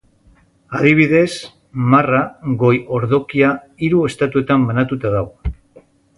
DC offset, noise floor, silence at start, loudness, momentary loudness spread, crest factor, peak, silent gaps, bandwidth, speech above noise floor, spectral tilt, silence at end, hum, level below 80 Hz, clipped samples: under 0.1%; -52 dBFS; 0.7 s; -16 LUFS; 14 LU; 16 dB; 0 dBFS; none; 11.5 kHz; 37 dB; -7.5 dB/octave; 0.65 s; none; -38 dBFS; under 0.1%